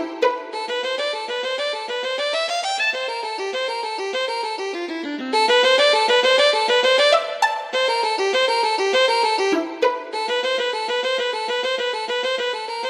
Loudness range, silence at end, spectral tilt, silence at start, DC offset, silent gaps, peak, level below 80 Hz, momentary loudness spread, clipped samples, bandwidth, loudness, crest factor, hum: 6 LU; 0 s; 0 dB/octave; 0 s; under 0.1%; none; -4 dBFS; -78 dBFS; 10 LU; under 0.1%; 14.5 kHz; -20 LUFS; 16 dB; none